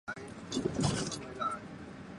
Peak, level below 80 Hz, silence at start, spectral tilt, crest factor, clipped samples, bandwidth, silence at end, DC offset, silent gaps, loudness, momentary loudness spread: -16 dBFS; -56 dBFS; 0.05 s; -4.5 dB/octave; 20 dB; under 0.1%; 11.5 kHz; 0 s; under 0.1%; none; -36 LUFS; 13 LU